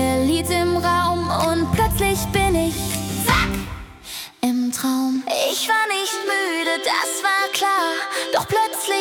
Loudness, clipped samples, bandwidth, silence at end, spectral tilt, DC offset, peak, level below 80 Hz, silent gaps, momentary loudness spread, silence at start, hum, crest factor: -20 LUFS; under 0.1%; 18 kHz; 0 s; -3.5 dB/octave; under 0.1%; -2 dBFS; -36 dBFS; none; 5 LU; 0 s; none; 18 dB